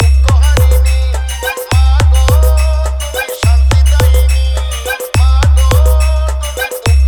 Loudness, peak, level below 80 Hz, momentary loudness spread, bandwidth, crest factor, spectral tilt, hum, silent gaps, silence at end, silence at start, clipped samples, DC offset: -11 LUFS; 0 dBFS; -10 dBFS; 8 LU; 20 kHz; 8 dB; -4.5 dB/octave; none; none; 0 s; 0 s; under 0.1%; under 0.1%